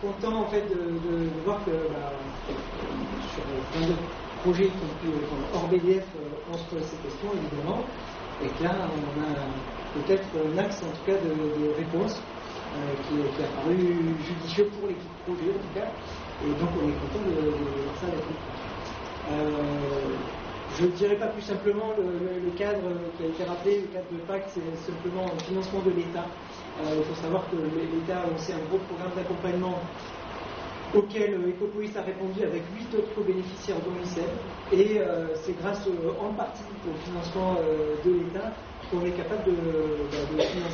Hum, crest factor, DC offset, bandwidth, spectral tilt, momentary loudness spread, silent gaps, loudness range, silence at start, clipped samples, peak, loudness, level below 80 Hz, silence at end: none; 20 dB; under 0.1%; 6.8 kHz; -5.5 dB/octave; 10 LU; none; 3 LU; 0 s; under 0.1%; -10 dBFS; -29 LUFS; -48 dBFS; 0 s